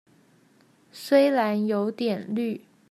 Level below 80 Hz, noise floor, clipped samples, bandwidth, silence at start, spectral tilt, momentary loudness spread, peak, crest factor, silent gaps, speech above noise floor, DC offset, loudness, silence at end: -82 dBFS; -60 dBFS; under 0.1%; 14.5 kHz; 0.95 s; -6 dB/octave; 13 LU; -8 dBFS; 18 dB; none; 36 dB; under 0.1%; -24 LUFS; 0.3 s